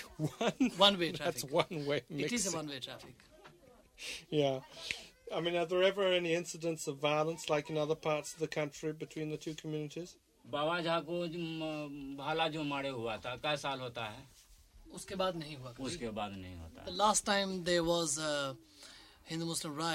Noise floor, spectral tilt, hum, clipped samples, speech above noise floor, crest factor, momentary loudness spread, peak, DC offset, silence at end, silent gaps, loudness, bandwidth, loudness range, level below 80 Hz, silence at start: -62 dBFS; -3.5 dB/octave; none; under 0.1%; 26 dB; 26 dB; 14 LU; -12 dBFS; under 0.1%; 0 s; none; -35 LUFS; 16 kHz; 6 LU; -66 dBFS; 0 s